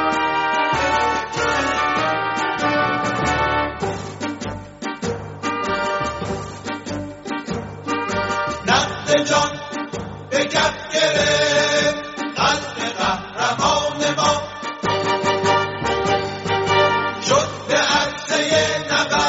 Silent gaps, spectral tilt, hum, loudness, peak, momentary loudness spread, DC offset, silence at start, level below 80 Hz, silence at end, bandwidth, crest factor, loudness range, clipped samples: none; -2 dB/octave; none; -20 LUFS; -2 dBFS; 11 LU; under 0.1%; 0 s; -46 dBFS; 0 s; 8 kHz; 18 dB; 6 LU; under 0.1%